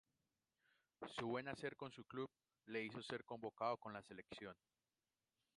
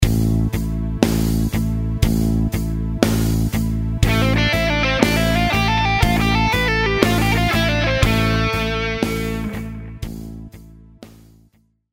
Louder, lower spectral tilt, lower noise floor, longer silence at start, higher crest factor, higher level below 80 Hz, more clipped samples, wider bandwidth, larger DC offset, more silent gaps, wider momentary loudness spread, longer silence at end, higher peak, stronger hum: second, -50 LUFS vs -18 LUFS; about the same, -5.5 dB/octave vs -5.5 dB/octave; first, under -90 dBFS vs -57 dBFS; first, 1 s vs 0 s; about the same, 22 dB vs 18 dB; second, -84 dBFS vs -26 dBFS; neither; second, 11 kHz vs 16.5 kHz; neither; neither; about the same, 11 LU vs 9 LU; first, 1.05 s vs 0.85 s; second, -30 dBFS vs 0 dBFS; neither